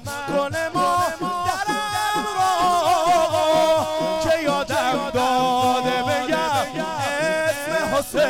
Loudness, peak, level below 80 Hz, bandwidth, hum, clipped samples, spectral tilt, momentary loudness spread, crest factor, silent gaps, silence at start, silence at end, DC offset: -21 LUFS; -10 dBFS; -48 dBFS; 17.5 kHz; none; under 0.1%; -3.5 dB/octave; 5 LU; 12 dB; none; 0 s; 0 s; 0.3%